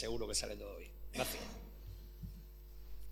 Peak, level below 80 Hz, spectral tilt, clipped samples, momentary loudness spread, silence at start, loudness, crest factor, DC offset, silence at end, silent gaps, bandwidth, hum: -22 dBFS; -52 dBFS; -3 dB/octave; under 0.1%; 18 LU; 0 s; -44 LUFS; 22 dB; under 0.1%; 0 s; none; 19 kHz; none